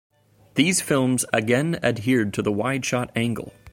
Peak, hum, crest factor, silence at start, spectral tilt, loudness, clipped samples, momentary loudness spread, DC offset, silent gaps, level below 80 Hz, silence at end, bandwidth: -4 dBFS; none; 20 dB; 0.55 s; -4.5 dB/octave; -22 LUFS; under 0.1%; 5 LU; under 0.1%; none; -56 dBFS; 0.05 s; 16.5 kHz